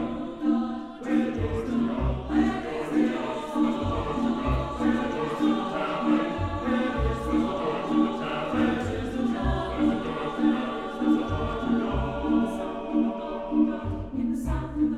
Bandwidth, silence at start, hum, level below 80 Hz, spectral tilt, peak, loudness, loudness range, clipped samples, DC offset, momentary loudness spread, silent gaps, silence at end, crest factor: 11 kHz; 0 s; none; -38 dBFS; -7.5 dB/octave; -12 dBFS; -27 LUFS; 1 LU; under 0.1%; under 0.1%; 5 LU; none; 0 s; 14 dB